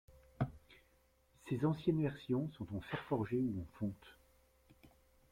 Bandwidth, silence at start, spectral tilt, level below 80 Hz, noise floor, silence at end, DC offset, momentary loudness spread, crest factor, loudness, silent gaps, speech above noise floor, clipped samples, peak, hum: 15.5 kHz; 0.1 s; -8.5 dB/octave; -64 dBFS; -72 dBFS; 0.45 s; under 0.1%; 9 LU; 20 dB; -40 LUFS; none; 34 dB; under 0.1%; -22 dBFS; none